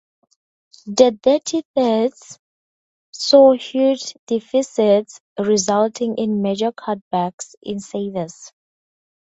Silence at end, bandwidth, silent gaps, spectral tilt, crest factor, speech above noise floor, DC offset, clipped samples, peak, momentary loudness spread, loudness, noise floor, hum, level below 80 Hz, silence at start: 0.9 s; 8 kHz; 1.65-1.74 s, 2.39-3.13 s, 4.19-4.27 s, 5.20-5.36 s, 7.02-7.11 s, 7.33-7.38 s, 7.57-7.62 s; -4.5 dB/octave; 20 dB; over 72 dB; under 0.1%; under 0.1%; 0 dBFS; 13 LU; -18 LUFS; under -90 dBFS; none; -62 dBFS; 0.85 s